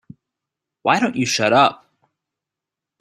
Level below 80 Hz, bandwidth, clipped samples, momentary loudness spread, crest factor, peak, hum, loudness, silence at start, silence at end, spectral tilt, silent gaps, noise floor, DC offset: -62 dBFS; 13.5 kHz; under 0.1%; 5 LU; 20 dB; -2 dBFS; none; -17 LUFS; 0.85 s; 1.25 s; -3.5 dB/octave; none; -86 dBFS; under 0.1%